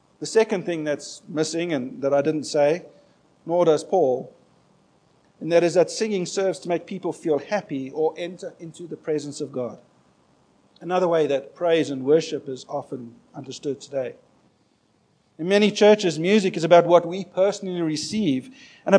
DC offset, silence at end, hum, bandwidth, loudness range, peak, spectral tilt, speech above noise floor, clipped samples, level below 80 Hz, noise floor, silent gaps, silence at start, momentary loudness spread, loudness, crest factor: under 0.1%; 0 s; none; 10.5 kHz; 9 LU; 0 dBFS; -5 dB/octave; 42 dB; under 0.1%; -74 dBFS; -64 dBFS; none; 0.2 s; 16 LU; -23 LUFS; 24 dB